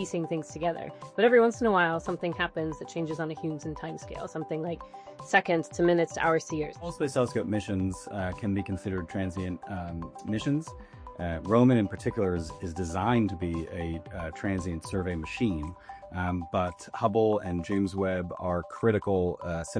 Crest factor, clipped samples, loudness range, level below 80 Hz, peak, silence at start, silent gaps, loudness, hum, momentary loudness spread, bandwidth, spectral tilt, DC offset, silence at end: 20 dB; under 0.1%; 5 LU; -50 dBFS; -8 dBFS; 0 s; none; -29 LUFS; none; 13 LU; 10.5 kHz; -6.5 dB/octave; under 0.1%; 0 s